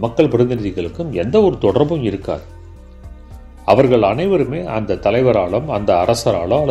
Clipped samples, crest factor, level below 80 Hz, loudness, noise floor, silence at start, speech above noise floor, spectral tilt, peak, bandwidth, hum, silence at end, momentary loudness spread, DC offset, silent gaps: under 0.1%; 16 dB; -38 dBFS; -16 LUFS; -36 dBFS; 0 s; 21 dB; -7 dB/octave; 0 dBFS; 13 kHz; none; 0 s; 10 LU; under 0.1%; none